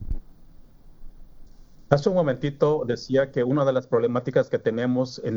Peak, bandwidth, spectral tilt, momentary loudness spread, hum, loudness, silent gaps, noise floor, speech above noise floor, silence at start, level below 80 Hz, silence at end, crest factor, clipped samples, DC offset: -2 dBFS; 7.6 kHz; -7.5 dB/octave; 4 LU; none; -23 LUFS; none; -47 dBFS; 24 dB; 0 s; -42 dBFS; 0 s; 22 dB; under 0.1%; under 0.1%